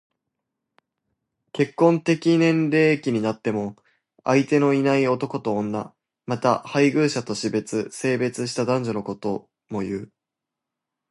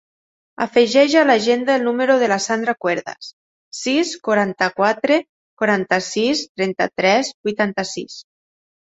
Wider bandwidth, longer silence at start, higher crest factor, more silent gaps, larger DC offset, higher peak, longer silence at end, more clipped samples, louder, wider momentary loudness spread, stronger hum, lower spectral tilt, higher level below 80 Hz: first, 11.5 kHz vs 8.2 kHz; first, 1.55 s vs 0.6 s; about the same, 20 dB vs 18 dB; second, none vs 3.33-3.71 s, 5.29-5.57 s, 6.49-6.55 s, 7.34-7.44 s; neither; about the same, -4 dBFS vs -2 dBFS; first, 1.05 s vs 0.7 s; neither; second, -22 LUFS vs -18 LUFS; about the same, 12 LU vs 13 LU; neither; first, -6 dB/octave vs -4 dB/octave; about the same, -64 dBFS vs -64 dBFS